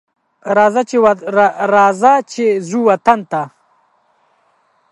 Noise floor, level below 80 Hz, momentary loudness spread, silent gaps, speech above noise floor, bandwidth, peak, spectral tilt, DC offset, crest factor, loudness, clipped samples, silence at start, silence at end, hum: -58 dBFS; -62 dBFS; 9 LU; none; 45 dB; 11.5 kHz; 0 dBFS; -5.5 dB/octave; under 0.1%; 14 dB; -13 LUFS; under 0.1%; 0.45 s; 1.45 s; none